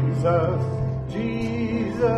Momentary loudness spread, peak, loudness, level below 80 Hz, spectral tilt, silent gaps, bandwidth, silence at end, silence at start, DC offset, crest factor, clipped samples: 6 LU; -8 dBFS; -24 LUFS; -42 dBFS; -8.5 dB/octave; none; 8.4 kHz; 0 s; 0 s; under 0.1%; 14 dB; under 0.1%